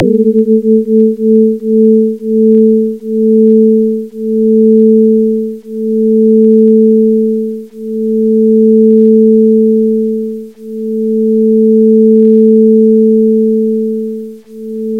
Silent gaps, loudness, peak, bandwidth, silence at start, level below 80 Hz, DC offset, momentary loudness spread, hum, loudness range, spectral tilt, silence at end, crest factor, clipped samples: none; -9 LUFS; 0 dBFS; 0.6 kHz; 0 s; -56 dBFS; 0.3%; 12 LU; none; 1 LU; -11.5 dB/octave; 0 s; 8 dB; 0.2%